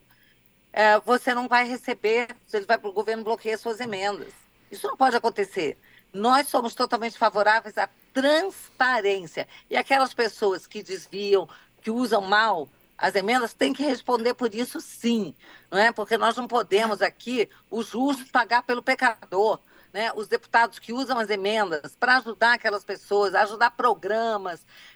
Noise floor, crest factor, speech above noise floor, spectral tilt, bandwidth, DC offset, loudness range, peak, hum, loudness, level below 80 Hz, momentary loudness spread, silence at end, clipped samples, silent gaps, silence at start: -60 dBFS; 18 dB; 36 dB; -3.5 dB/octave; over 20 kHz; under 0.1%; 3 LU; -6 dBFS; none; -24 LUFS; -70 dBFS; 11 LU; 0.4 s; under 0.1%; none; 0.75 s